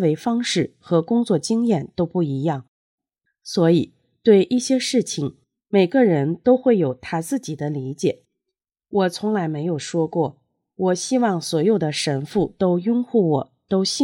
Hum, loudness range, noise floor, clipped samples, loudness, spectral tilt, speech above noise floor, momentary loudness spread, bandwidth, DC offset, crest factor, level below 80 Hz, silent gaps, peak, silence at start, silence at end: none; 5 LU; -83 dBFS; under 0.1%; -21 LUFS; -5.5 dB/octave; 64 dB; 10 LU; 16.5 kHz; under 0.1%; 18 dB; -60 dBFS; 2.68-2.98 s; -2 dBFS; 0 s; 0 s